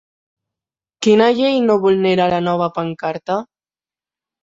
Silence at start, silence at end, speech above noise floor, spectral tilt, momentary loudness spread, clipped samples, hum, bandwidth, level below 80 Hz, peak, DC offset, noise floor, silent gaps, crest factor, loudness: 1 s; 1 s; over 75 dB; -6 dB/octave; 10 LU; under 0.1%; none; 7.8 kHz; -58 dBFS; -2 dBFS; under 0.1%; under -90 dBFS; none; 16 dB; -16 LUFS